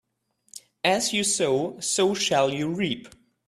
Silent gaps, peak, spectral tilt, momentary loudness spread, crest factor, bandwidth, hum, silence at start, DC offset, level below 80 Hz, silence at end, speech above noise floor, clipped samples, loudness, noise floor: none; -8 dBFS; -3 dB/octave; 15 LU; 18 dB; 14.5 kHz; none; 0.55 s; under 0.1%; -66 dBFS; 0.4 s; 46 dB; under 0.1%; -24 LUFS; -70 dBFS